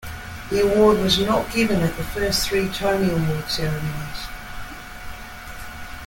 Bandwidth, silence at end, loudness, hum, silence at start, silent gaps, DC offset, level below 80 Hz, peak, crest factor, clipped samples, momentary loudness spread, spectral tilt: 17 kHz; 0 s; -21 LUFS; none; 0 s; none; under 0.1%; -38 dBFS; -4 dBFS; 18 dB; under 0.1%; 20 LU; -5 dB/octave